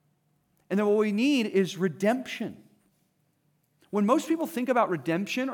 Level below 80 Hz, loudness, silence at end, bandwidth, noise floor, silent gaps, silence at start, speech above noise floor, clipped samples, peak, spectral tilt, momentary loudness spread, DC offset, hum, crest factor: -82 dBFS; -27 LUFS; 0 s; 19.5 kHz; -71 dBFS; none; 0.7 s; 45 dB; under 0.1%; -10 dBFS; -5.5 dB/octave; 8 LU; under 0.1%; none; 18 dB